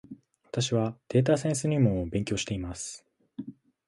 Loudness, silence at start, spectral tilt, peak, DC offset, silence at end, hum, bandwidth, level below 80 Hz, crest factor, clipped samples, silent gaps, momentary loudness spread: -28 LUFS; 0.1 s; -5.5 dB/octave; -10 dBFS; under 0.1%; 0.35 s; none; 11.5 kHz; -50 dBFS; 18 dB; under 0.1%; none; 18 LU